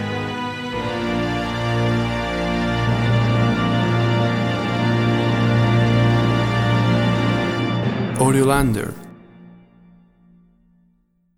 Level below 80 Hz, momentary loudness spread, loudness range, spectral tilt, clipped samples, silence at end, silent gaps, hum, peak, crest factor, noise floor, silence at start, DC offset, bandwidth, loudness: -38 dBFS; 8 LU; 4 LU; -6.5 dB/octave; under 0.1%; 1.85 s; none; none; -4 dBFS; 16 dB; -62 dBFS; 0 s; under 0.1%; 13 kHz; -19 LUFS